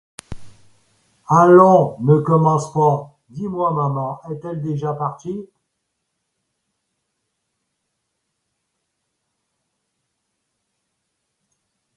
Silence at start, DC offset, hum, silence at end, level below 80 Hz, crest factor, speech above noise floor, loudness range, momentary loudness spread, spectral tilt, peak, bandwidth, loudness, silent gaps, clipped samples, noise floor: 0.3 s; under 0.1%; none; 6.5 s; -54 dBFS; 20 dB; 59 dB; 15 LU; 20 LU; -8.5 dB/octave; 0 dBFS; 11.5 kHz; -16 LUFS; none; under 0.1%; -75 dBFS